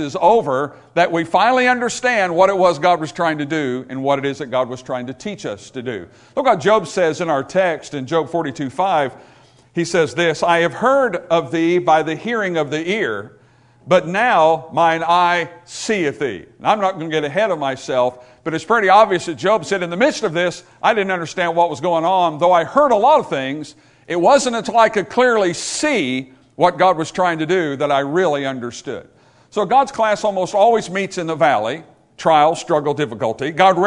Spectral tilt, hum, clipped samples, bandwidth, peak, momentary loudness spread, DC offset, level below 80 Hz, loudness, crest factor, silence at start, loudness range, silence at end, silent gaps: -4.5 dB/octave; none; under 0.1%; 11 kHz; 0 dBFS; 12 LU; under 0.1%; -58 dBFS; -17 LUFS; 18 dB; 0 s; 4 LU; 0 s; none